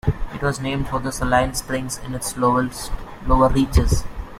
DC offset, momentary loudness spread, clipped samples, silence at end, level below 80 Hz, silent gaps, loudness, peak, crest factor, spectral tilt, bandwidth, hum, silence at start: under 0.1%; 10 LU; under 0.1%; 0 s; -26 dBFS; none; -21 LUFS; -2 dBFS; 18 dB; -5.5 dB/octave; 16 kHz; none; 0.05 s